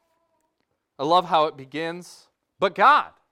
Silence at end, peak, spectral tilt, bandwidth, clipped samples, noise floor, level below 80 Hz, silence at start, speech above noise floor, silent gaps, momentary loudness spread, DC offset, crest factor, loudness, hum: 0.25 s; -4 dBFS; -4.5 dB/octave; 14 kHz; under 0.1%; -75 dBFS; -70 dBFS; 1 s; 54 dB; none; 14 LU; under 0.1%; 20 dB; -21 LUFS; none